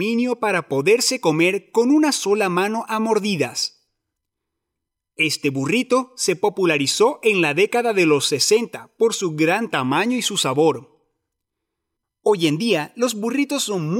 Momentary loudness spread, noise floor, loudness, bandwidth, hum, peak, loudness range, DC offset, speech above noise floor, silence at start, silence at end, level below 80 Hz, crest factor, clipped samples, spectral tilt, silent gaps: 5 LU; -82 dBFS; -19 LUFS; 16.5 kHz; none; -6 dBFS; 5 LU; under 0.1%; 62 dB; 0 s; 0 s; -74 dBFS; 14 dB; under 0.1%; -3.5 dB/octave; none